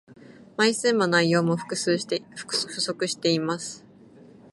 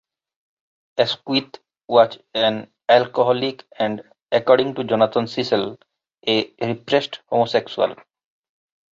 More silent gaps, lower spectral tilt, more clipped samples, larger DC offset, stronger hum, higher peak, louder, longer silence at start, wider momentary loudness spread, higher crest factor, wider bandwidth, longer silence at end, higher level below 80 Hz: neither; second, -4 dB/octave vs -5.5 dB/octave; neither; neither; neither; second, -8 dBFS vs -2 dBFS; second, -24 LUFS vs -20 LUFS; second, 0.1 s vs 0.95 s; about the same, 11 LU vs 9 LU; about the same, 18 dB vs 20 dB; first, 11.5 kHz vs 7.6 kHz; second, 0.75 s vs 1 s; second, -72 dBFS vs -64 dBFS